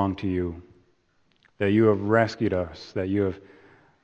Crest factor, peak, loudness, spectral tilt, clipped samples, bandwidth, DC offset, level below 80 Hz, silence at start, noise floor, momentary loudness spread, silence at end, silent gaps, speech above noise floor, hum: 20 dB; -6 dBFS; -25 LUFS; -8 dB/octave; under 0.1%; 8.2 kHz; under 0.1%; -54 dBFS; 0 s; -66 dBFS; 12 LU; 0.65 s; none; 42 dB; none